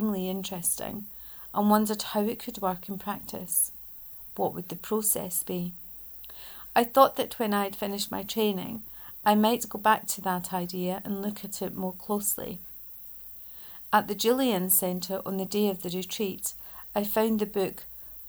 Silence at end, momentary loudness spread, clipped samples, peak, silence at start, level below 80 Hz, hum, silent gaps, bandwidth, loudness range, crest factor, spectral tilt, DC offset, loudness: 0 s; 14 LU; under 0.1%; -6 dBFS; 0 s; -60 dBFS; none; none; over 20 kHz; 3 LU; 22 dB; -4 dB/octave; under 0.1%; -28 LUFS